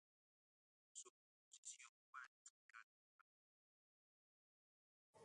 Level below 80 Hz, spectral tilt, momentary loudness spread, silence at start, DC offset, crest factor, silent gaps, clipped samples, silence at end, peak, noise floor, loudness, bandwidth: under -90 dBFS; 1 dB/octave; 8 LU; 0.95 s; under 0.1%; 26 dB; 1.10-1.51 s, 1.58-1.63 s, 1.89-2.13 s, 2.27-2.69 s, 2.83-5.13 s; under 0.1%; 0 s; -42 dBFS; under -90 dBFS; -62 LUFS; 11 kHz